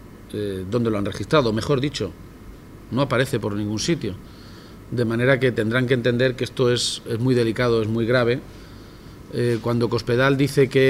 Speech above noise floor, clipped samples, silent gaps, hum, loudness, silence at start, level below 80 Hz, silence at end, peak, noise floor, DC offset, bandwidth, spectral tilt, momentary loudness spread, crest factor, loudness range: 20 dB; under 0.1%; none; none; -22 LUFS; 0 s; -46 dBFS; 0 s; -4 dBFS; -41 dBFS; under 0.1%; 16 kHz; -5.5 dB/octave; 22 LU; 18 dB; 4 LU